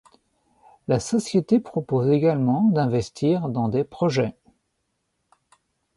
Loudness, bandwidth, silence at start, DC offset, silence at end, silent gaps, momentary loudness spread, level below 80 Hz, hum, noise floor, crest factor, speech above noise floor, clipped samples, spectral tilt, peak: -22 LUFS; 11.5 kHz; 0.9 s; under 0.1%; 1.65 s; none; 6 LU; -56 dBFS; none; -75 dBFS; 16 dB; 53 dB; under 0.1%; -7 dB/octave; -8 dBFS